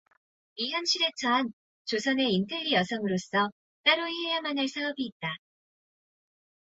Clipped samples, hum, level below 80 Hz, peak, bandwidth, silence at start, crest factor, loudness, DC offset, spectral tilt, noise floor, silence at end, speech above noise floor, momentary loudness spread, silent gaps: under 0.1%; none; -74 dBFS; -10 dBFS; 8 kHz; 0.55 s; 22 dB; -28 LUFS; under 0.1%; -3.5 dB/octave; under -90 dBFS; 1.4 s; over 61 dB; 11 LU; 1.53-1.85 s, 3.52-3.84 s, 5.12-5.20 s